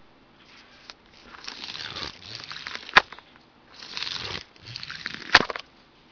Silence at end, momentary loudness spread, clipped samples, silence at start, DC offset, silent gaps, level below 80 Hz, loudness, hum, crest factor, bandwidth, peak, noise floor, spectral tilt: 0.5 s; 26 LU; under 0.1%; 0.5 s; under 0.1%; none; -56 dBFS; -26 LUFS; none; 30 dB; 5.4 kHz; 0 dBFS; -55 dBFS; -2 dB/octave